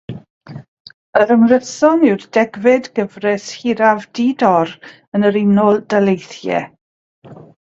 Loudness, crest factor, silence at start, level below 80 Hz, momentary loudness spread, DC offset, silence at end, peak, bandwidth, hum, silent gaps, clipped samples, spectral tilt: -15 LUFS; 16 dB; 0.1 s; -58 dBFS; 18 LU; under 0.1%; 0.3 s; 0 dBFS; 7.8 kHz; none; 0.30-0.41 s, 0.68-0.85 s, 0.94-1.13 s, 5.08-5.12 s, 6.81-7.22 s; under 0.1%; -6 dB/octave